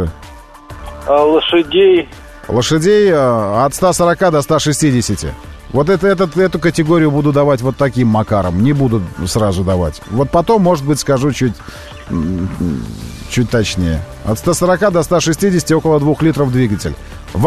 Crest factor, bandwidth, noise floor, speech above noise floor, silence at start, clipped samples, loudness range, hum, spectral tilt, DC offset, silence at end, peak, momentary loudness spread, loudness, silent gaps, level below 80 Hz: 12 dB; 13.5 kHz; -33 dBFS; 20 dB; 0 s; under 0.1%; 4 LU; none; -5.5 dB/octave; 0.5%; 0 s; -2 dBFS; 12 LU; -13 LUFS; none; -32 dBFS